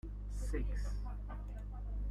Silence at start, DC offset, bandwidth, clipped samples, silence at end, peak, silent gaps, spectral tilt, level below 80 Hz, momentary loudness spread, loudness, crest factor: 0.05 s; under 0.1%; 11.5 kHz; under 0.1%; 0 s; -26 dBFS; none; -7 dB/octave; -40 dBFS; 7 LU; -44 LUFS; 12 dB